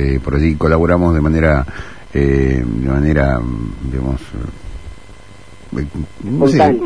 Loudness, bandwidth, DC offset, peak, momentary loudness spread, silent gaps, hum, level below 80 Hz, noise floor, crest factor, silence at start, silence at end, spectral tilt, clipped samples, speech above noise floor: -15 LUFS; 10.5 kHz; 2%; 0 dBFS; 15 LU; none; none; -24 dBFS; -39 dBFS; 14 dB; 0 s; 0 s; -8.5 dB/octave; under 0.1%; 25 dB